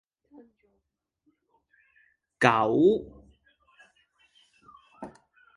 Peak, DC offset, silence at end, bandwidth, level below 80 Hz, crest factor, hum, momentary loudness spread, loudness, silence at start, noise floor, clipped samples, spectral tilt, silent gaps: -4 dBFS; under 0.1%; 0.5 s; 11 kHz; -64 dBFS; 28 dB; none; 25 LU; -23 LUFS; 2.4 s; -80 dBFS; under 0.1%; -6 dB/octave; none